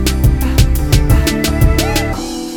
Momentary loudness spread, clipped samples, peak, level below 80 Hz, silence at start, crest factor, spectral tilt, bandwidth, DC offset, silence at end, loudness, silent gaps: 5 LU; under 0.1%; 0 dBFS; -16 dBFS; 0 s; 12 dB; -5 dB/octave; over 20 kHz; under 0.1%; 0 s; -14 LUFS; none